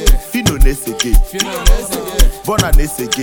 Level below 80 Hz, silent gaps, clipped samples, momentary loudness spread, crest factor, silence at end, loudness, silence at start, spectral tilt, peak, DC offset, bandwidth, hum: -12 dBFS; none; 0.1%; 4 LU; 12 dB; 0 s; -16 LUFS; 0 s; -3.5 dB/octave; 0 dBFS; 0.3%; 19 kHz; none